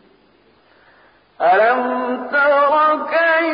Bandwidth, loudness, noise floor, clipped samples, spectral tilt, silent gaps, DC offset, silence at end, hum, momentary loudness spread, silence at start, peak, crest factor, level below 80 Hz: 5.2 kHz; -15 LUFS; -54 dBFS; under 0.1%; -8.5 dB/octave; none; under 0.1%; 0 s; none; 7 LU; 1.4 s; -4 dBFS; 12 dB; -66 dBFS